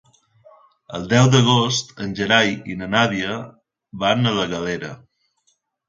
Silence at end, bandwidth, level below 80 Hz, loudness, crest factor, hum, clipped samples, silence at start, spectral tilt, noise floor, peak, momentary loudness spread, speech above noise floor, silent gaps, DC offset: 0.95 s; 7.6 kHz; -52 dBFS; -19 LUFS; 20 dB; none; under 0.1%; 0.9 s; -4.5 dB/octave; -67 dBFS; 0 dBFS; 17 LU; 48 dB; none; under 0.1%